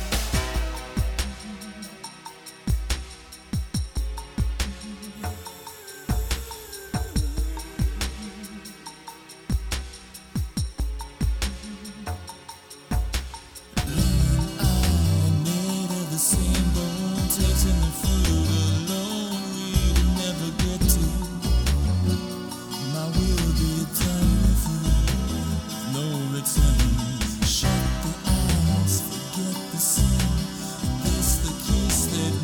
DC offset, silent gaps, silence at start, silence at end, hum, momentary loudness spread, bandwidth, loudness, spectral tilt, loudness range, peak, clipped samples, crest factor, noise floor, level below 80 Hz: under 0.1%; none; 0 s; 0 s; none; 16 LU; 19.5 kHz; -25 LUFS; -4.5 dB/octave; 9 LU; -6 dBFS; under 0.1%; 18 dB; -43 dBFS; -28 dBFS